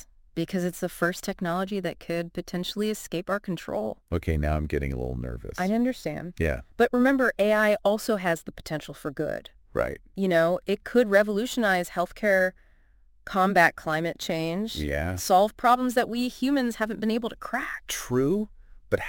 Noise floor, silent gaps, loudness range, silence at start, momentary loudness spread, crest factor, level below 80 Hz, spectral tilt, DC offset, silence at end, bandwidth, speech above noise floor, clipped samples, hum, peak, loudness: -58 dBFS; none; 6 LU; 0.35 s; 10 LU; 20 dB; -42 dBFS; -5.5 dB/octave; under 0.1%; 0 s; 17 kHz; 32 dB; under 0.1%; none; -6 dBFS; -26 LUFS